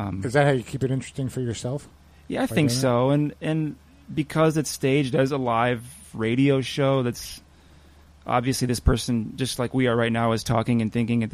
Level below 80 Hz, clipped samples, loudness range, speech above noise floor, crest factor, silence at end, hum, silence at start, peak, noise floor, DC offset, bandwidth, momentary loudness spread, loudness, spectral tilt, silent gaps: -40 dBFS; under 0.1%; 2 LU; 28 dB; 18 dB; 0.05 s; none; 0 s; -6 dBFS; -52 dBFS; under 0.1%; 15.5 kHz; 10 LU; -24 LUFS; -6 dB/octave; none